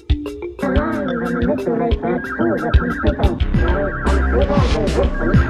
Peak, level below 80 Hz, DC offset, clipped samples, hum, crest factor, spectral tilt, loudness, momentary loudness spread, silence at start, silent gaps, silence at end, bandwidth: 0 dBFS; -22 dBFS; under 0.1%; under 0.1%; none; 16 dB; -7.5 dB/octave; -19 LUFS; 4 LU; 0.1 s; none; 0 s; 10.5 kHz